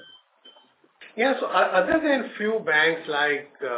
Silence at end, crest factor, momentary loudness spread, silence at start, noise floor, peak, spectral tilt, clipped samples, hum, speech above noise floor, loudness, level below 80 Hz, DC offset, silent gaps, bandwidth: 0 s; 16 dB; 7 LU; 0.45 s; -58 dBFS; -8 dBFS; -7.5 dB/octave; under 0.1%; none; 35 dB; -22 LUFS; -64 dBFS; under 0.1%; none; 4 kHz